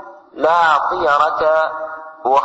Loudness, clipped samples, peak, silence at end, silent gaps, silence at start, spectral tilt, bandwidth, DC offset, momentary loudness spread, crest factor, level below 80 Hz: -15 LUFS; under 0.1%; -2 dBFS; 0 s; none; 0 s; -4 dB/octave; 8 kHz; under 0.1%; 14 LU; 14 dB; -54 dBFS